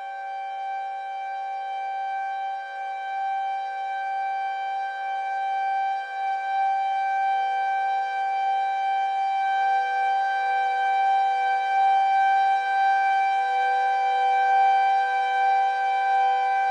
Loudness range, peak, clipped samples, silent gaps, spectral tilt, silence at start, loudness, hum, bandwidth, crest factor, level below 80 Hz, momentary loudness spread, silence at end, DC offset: 8 LU; -14 dBFS; under 0.1%; none; 2.5 dB/octave; 0 s; -24 LUFS; none; 8.2 kHz; 10 dB; under -90 dBFS; 10 LU; 0 s; under 0.1%